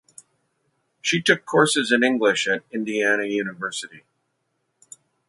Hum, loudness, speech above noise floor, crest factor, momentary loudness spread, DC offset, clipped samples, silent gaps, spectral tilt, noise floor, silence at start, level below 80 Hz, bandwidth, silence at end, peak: none; -21 LUFS; 52 dB; 22 dB; 11 LU; under 0.1%; under 0.1%; none; -3.5 dB/octave; -74 dBFS; 1.05 s; -72 dBFS; 11.5 kHz; 1.3 s; -2 dBFS